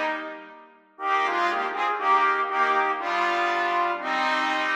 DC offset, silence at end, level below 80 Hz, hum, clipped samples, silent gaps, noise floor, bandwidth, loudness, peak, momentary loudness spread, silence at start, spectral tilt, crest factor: under 0.1%; 0 s; -82 dBFS; none; under 0.1%; none; -49 dBFS; 11.5 kHz; -24 LUFS; -10 dBFS; 8 LU; 0 s; -2 dB/octave; 14 dB